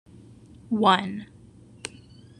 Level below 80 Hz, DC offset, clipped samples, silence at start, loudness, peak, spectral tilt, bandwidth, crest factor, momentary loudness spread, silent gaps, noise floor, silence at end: -62 dBFS; under 0.1%; under 0.1%; 0.7 s; -23 LUFS; -4 dBFS; -5 dB/octave; 11 kHz; 24 dB; 19 LU; none; -50 dBFS; 0.5 s